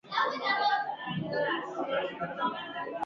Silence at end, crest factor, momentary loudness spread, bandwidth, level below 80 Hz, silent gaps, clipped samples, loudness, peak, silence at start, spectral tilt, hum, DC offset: 0 s; 16 dB; 8 LU; 7.4 kHz; -72 dBFS; none; under 0.1%; -31 LUFS; -16 dBFS; 0.05 s; -2 dB/octave; none; under 0.1%